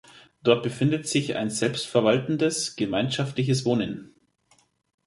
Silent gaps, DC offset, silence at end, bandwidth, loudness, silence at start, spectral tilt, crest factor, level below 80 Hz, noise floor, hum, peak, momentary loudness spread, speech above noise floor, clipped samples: none; under 0.1%; 1 s; 11.5 kHz; -25 LUFS; 0.45 s; -5 dB/octave; 22 dB; -62 dBFS; -64 dBFS; none; -4 dBFS; 5 LU; 40 dB; under 0.1%